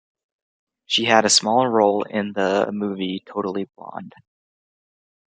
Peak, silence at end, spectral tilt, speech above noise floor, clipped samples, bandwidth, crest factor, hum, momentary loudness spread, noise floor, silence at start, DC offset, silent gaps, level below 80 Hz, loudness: -2 dBFS; 1.15 s; -3 dB/octave; over 69 dB; under 0.1%; 9.6 kHz; 22 dB; none; 17 LU; under -90 dBFS; 0.9 s; under 0.1%; none; -70 dBFS; -20 LUFS